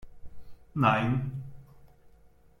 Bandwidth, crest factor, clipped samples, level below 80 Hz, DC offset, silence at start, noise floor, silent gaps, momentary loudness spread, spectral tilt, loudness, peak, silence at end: 7 kHz; 22 dB; under 0.1%; -54 dBFS; under 0.1%; 0 s; -58 dBFS; none; 18 LU; -8 dB/octave; -28 LUFS; -10 dBFS; 0.75 s